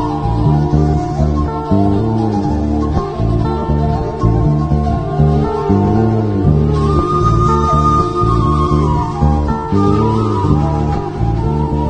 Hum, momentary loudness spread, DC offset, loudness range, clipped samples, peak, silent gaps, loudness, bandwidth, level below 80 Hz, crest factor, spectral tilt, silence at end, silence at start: none; 4 LU; 0.8%; 3 LU; under 0.1%; 0 dBFS; none; -14 LUFS; 8.8 kHz; -22 dBFS; 12 dB; -9 dB/octave; 0 s; 0 s